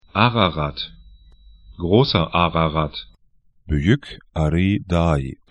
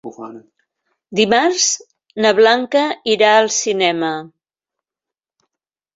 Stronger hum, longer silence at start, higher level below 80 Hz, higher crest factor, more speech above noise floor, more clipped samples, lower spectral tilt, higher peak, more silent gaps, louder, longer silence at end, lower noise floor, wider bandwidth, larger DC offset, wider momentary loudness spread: neither; about the same, 0.15 s vs 0.05 s; first, -34 dBFS vs -64 dBFS; about the same, 20 dB vs 16 dB; second, 39 dB vs 72 dB; neither; first, -7.5 dB/octave vs -2 dB/octave; about the same, 0 dBFS vs -2 dBFS; neither; second, -20 LUFS vs -15 LUFS; second, 0.15 s vs 1.7 s; second, -58 dBFS vs -87 dBFS; first, 10 kHz vs 8 kHz; neither; second, 13 LU vs 18 LU